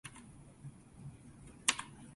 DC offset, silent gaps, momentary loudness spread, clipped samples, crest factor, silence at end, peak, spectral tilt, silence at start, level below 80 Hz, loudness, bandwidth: under 0.1%; none; 22 LU; under 0.1%; 32 dB; 0 s; -12 dBFS; -1 dB/octave; 0.05 s; -66 dBFS; -36 LUFS; 11.5 kHz